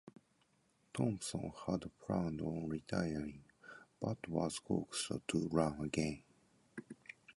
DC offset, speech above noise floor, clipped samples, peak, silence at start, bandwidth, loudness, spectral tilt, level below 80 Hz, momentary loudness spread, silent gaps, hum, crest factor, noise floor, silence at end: under 0.1%; 36 dB; under 0.1%; -18 dBFS; 0.05 s; 11.5 kHz; -40 LUFS; -5.5 dB/octave; -62 dBFS; 17 LU; none; none; 24 dB; -76 dBFS; 0.05 s